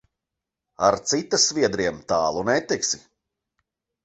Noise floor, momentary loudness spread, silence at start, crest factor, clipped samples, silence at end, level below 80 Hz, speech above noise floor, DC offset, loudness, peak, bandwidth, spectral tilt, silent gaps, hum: -86 dBFS; 6 LU; 0.8 s; 22 dB; under 0.1%; 1.05 s; -56 dBFS; 63 dB; under 0.1%; -22 LUFS; -4 dBFS; 8.4 kHz; -2.5 dB/octave; none; none